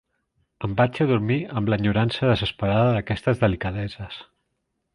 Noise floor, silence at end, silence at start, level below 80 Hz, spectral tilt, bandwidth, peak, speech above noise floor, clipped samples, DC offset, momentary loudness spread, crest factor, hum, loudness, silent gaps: -76 dBFS; 0.7 s; 0.6 s; -44 dBFS; -8 dB/octave; 10.5 kHz; -4 dBFS; 54 dB; under 0.1%; under 0.1%; 12 LU; 20 dB; none; -23 LUFS; none